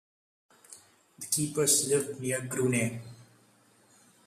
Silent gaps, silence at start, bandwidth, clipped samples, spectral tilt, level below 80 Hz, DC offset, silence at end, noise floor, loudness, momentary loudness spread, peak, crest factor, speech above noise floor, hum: none; 0.7 s; 14.5 kHz; under 0.1%; -3.5 dB/octave; -70 dBFS; under 0.1%; 1.05 s; -63 dBFS; -28 LUFS; 19 LU; -12 dBFS; 20 dB; 34 dB; none